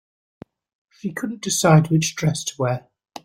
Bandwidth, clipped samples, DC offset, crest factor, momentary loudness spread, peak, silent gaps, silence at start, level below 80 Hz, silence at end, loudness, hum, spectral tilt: 15.5 kHz; under 0.1%; under 0.1%; 20 dB; 15 LU; -2 dBFS; none; 1.05 s; -58 dBFS; 0.45 s; -20 LUFS; none; -5 dB/octave